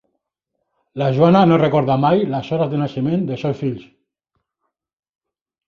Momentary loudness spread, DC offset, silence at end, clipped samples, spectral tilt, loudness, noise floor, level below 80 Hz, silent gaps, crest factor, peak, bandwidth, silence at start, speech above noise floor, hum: 12 LU; under 0.1%; 1.85 s; under 0.1%; -9 dB/octave; -17 LUFS; -76 dBFS; -56 dBFS; none; 18 dB; -2 dBFS; 6.8 kHz; 0.95 s; 60 dB; none